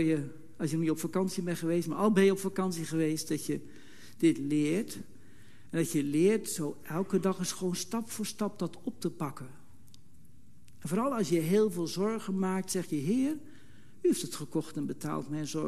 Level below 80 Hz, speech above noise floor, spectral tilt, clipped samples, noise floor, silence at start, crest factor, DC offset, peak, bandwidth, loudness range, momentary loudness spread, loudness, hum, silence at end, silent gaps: -68 dBFS; 29 dB; -5.5 dB/octave; under 0.1%; -60 dBFS; 0 s; 18 dB; 0.5%; -14 dBFS; 13 kHz; 5 LU; 10 LU; -32 LUFS; none; 0 s; none